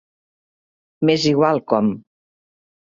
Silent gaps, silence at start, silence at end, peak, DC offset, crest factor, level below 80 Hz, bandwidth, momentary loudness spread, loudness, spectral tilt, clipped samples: none; 1 s; 0.95 s; -2 dBFS; under 0.1%; 20 dB; -60 dBFS; 7.6 kHz; 7 LU; -18 LUFS; -6 dB/octave; under 0.1%